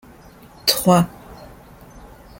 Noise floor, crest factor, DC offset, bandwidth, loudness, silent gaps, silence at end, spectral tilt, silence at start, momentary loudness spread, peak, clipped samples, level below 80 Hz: -45 dBFS; 22 dB; under 0.1%; 17 kHz; -18 LUFS; none; 0.35 s; -4.5 dB/octave; 0.65 s; 26 LU; -2 dBFS; under 0.1%; -48 dBFS